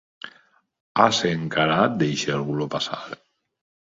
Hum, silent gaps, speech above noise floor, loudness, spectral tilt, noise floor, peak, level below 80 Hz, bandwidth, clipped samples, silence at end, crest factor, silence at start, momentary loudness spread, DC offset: none; 0.80-0.95 s; 36 dB; -22 LUFS; -4.5 dB/octave; -58 dBFS; 0 dBFS; -60 dBFS; 7.8 kHz; under 0.1%; 0.7 s; 24 dB; 0.25 s; 22 LU; under 0.1%